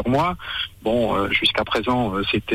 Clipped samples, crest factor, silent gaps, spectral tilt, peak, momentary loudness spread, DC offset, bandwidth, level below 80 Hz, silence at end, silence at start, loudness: under 0.1%; 14 dB; none; -5.5 dB/octave; -8 dBFS; 7 LU; under 0.1%; 16 kHz; -42 dBFS; 0 s; 0 s; -21 LUFS